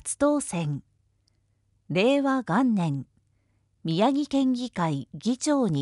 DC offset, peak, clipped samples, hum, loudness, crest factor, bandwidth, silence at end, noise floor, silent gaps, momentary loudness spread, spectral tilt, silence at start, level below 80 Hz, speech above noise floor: under 0.1%; -10 dBFS; under 0.1%; none; -26 LUFS; 16 dB; 11.5 kHz; 0 s; -69 dBFS; none; 8 LU; -5.5 dB/octave; 0.05 s; -62 dBFS; 44 dB